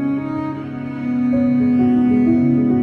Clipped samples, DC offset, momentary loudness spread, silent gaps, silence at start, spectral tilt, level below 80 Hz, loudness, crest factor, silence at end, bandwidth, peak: under 0.1%; under 0.1%; 11 LU; none; 0 s; -10.5 dB/octave; -48 dBFS; -17 LUFS; 10 dB; 0 s; 4.3 kHz; -6 dBFS